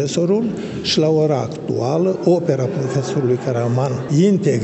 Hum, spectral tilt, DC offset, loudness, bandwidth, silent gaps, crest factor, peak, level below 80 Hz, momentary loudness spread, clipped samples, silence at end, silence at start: none; -6.5 dB/octave; under 0.1%; -18 LUFS; 8.4 kHz; none; 14 dB; -2 dBFS; -56 dBFS; 6 LU; under 0.1%; 0 s; 0 s